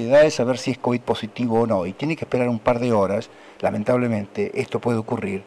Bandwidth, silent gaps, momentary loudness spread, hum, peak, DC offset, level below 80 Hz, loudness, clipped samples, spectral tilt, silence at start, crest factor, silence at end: 11.5 kHz; none; 7 LU; none; -8 dBFS; under 0.1%; -54 dBFS; -22 LUFS; under 0.1%; -6.5 dB/octave; 0 s; 12 dB; 0.05 s